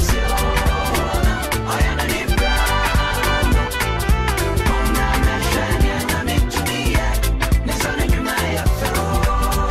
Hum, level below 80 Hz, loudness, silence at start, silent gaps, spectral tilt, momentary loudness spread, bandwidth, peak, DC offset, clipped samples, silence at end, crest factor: none; -20 dBFS; -19 LUFS; 0 s; none; -4.5 dB/octave; 3 LU; 15.5 kHz; -6 dBFS; under 0.1%; under 0.1%; 0 s; 12 dB